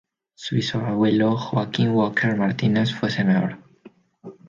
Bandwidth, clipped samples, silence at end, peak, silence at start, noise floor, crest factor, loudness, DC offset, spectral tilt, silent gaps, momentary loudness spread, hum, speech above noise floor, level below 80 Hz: 7.6 kHz; under 0.1%; 0.15 s; -8 dBFS; 0.4 s; -51 dBFS; 14 dB; -22 LUFS; under 0.1%; -7 dB/octave; none; 6 LU; none; 30 dB; -60 dBFS